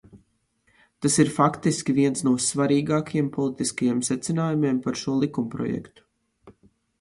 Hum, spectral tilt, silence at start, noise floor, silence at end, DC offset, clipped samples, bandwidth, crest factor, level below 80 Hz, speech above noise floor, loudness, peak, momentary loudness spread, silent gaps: none; -5 dB/octave; 0.15 s; -68 dBFS; 0.5 s; under 0.1%; under 0.1%; 11.5 kHz; 20 dB; -60 dBFS; 44 dB; -24 LUFS; -4 dBFS; 7 LU; none